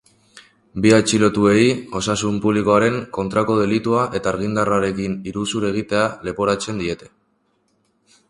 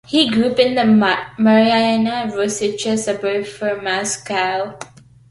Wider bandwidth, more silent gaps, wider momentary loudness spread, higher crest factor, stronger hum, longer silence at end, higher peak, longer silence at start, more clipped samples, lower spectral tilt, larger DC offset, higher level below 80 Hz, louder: about the same, 11.5 kHz vs 11.5 kHz; neither; about the same, 10 LU vs 9 LU; about the same, 18 dB vs 14 dB; neither; first, 1.25 s vs 0.45 s; about the same, 0 dBFS vs -2 dBFS; first, 0.35 s vs 0.1 s; neither; about the same, -5 dB/octave vs -4 dB/octave; neither; first, -48 dBFS vs -56 dBFS; about the same, -19 LUFS vs -17 LUFS